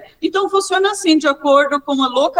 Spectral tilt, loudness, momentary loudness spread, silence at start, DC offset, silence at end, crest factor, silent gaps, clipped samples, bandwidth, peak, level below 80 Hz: -1.5 dB/octave; -15 LUFS; 4 LU; 0.2 s; under 0.1%; 0 s; 16 dB; none; under 0.1%; 16 kHz; 0 dBFS; -60 dBFS